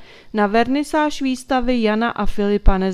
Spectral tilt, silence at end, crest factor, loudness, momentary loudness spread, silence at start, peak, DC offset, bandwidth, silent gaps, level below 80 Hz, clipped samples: -6 dB/octave; 0 s; 18 dB; -19 LUFS; 4 LU; 0 s; 0 dBFS; under 0.1%; 12.5 kHz; none; -26 dBFS; under 0.1%